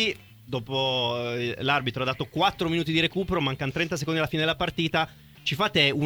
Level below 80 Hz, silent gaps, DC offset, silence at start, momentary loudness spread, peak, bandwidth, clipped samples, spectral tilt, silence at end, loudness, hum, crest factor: -52 dBFS; none; under 0.1%; 0 s; 6 LU; -8 dBFS; over 20 kHz; under 0.1%; -5 dB/octave; 0 s; -26 LUFS; none; 20 dB